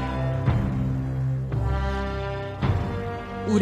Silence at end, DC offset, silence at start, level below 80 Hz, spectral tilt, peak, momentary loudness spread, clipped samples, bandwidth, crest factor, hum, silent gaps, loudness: 0 s; under 0.1%; 0 s; -32 dBFS; -8 dB/octave; -10 dBFS; 7 LU; under 0.1%; 8.4 kHz; 16 dB; none; none; -27 LUFS